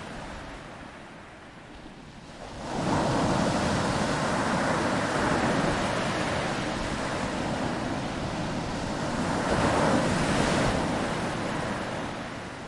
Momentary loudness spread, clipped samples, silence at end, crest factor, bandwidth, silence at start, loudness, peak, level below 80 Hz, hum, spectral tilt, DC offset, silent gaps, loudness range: 18 LU; under 0.1%; 0 s; 18 dB; 11.5 kHz; 0 s; -28 LUFS; -10 dBFS; -44 dBFS; none; -5 dB/octave; under 0.1%; none; 4 LU